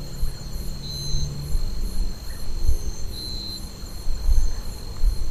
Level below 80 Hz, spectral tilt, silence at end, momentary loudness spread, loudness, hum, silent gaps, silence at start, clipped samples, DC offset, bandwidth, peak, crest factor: -24 dBFS; -4.5 dB/octave; 0 s; 8 LU; -31 LUFS; none; none; 0 s; under 0.1%; 0.8%; 13.5 kHz; -4 dBFS; 16 dB